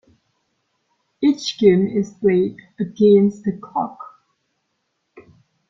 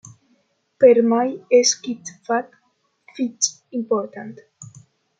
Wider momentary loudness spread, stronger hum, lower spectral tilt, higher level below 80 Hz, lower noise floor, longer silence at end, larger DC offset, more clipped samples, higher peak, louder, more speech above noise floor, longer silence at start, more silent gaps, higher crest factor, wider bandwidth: second, 15 LU vs 19 LU; neither; first, -7 dB/octave vs -2.5 dB/octave; first, -60 dBFS vs -74 dBFS; first, -72 dBFS vs -67 dBFS; about the same, 0.5 s vs 0.55 s; neither; neither; about the same, -2 dBFS vs -2 dBFS; about the same, -18 LUFS vs -19 LUFS; first, 55 dB vs 48 dB; first, 1.2 s vs 0.8 s; neither; about the same, 18 dB vs 20 dB; second, 7.6 kHz vs 9.4 kHz